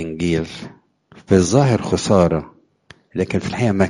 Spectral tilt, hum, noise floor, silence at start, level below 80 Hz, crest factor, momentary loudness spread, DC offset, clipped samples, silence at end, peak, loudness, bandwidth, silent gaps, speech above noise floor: -6 dB/octave; none; -50 dBFS; 0 s; -44 dBFS; 18 dB; 15 LU; under 0.1%; under 0.1%; 0 s; 0 dBFS; -18 LUFS; 11.5 kHz; none; 32 dB